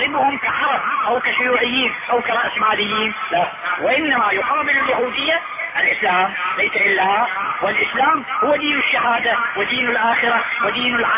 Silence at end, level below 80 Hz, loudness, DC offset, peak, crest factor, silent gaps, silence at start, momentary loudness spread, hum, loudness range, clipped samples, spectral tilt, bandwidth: 0 s; -56 dBFS; -17 LUFS; under 0.1%; -4 dBFS; 14 dB; none; 0 s; 4 LU; none; 1 LU; under 0.1%; -6.5 dB/octave; 3.9 kHz